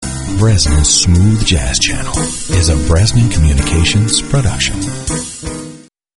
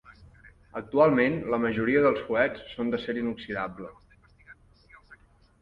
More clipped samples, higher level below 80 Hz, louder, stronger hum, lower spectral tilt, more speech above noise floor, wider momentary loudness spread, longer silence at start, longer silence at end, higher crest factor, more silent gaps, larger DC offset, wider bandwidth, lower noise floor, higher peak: neither; first, -20 dBFS vs -58 dBFS; first, -12 LUFS vs -26 LUFS; neither; second, -4 dB/octave vs -8.5 dB/octave; second, 23 dB vs 30 dB; second, 11 LU vs 17 LU; about the same, 0 s vs 0.1 s; about the same, 0.4 s vs 0.45 s; second, 12 dB vs 20 dB; neither; neither; first, 11.5 kHz vs 5.8 kHz; second, -35 dBFS vs -56 dBFS; first, 0 dBFS vs -8 dBFS